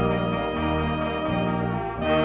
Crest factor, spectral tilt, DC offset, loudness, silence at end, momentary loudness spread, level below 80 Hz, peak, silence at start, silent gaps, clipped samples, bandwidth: 14 dB; -10.5 dB/octave; under 0.1%; -25 LUFS; 0 s; 2 LU; -38 dBFS; -10 dBFS; 0 s; none; under 0.1%; 4 kHz